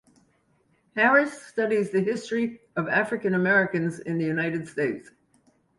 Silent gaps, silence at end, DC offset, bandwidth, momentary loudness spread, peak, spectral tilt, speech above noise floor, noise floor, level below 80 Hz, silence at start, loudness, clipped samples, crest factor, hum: none; 0.75 s; under 0.1%; 11.5 kHz; 10 LU; -8 dBFS; -6.5 dB/octave; 42 dB; -67 dBFS; -68 dBFS; 0.95 s; -25 LUFS; under 0.1%; 18 dB; none